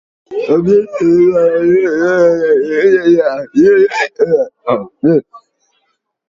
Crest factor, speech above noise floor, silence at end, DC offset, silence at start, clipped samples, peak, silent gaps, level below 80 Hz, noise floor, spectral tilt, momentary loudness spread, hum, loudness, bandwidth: 12 dB; 54 dB; 0.9 s; under 0.1%; 0.3 s; under 0.1%; 0 dBFS; none; -52 dBFS; -65 dBFS; -7 dB/octave; 6 LU; none; -11 LUFS; 7.4 kHz